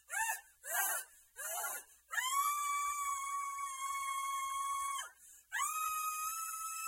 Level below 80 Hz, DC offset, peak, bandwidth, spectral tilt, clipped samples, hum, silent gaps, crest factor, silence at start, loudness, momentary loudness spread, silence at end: -80 dBFS; under 0.1%; -22 dBFS; 16.5 kHz; 3.5 dB/octave; under 0.1%; none; none; 18 dB; 0.1 s; -38 LUFS; 9 LU; 0 s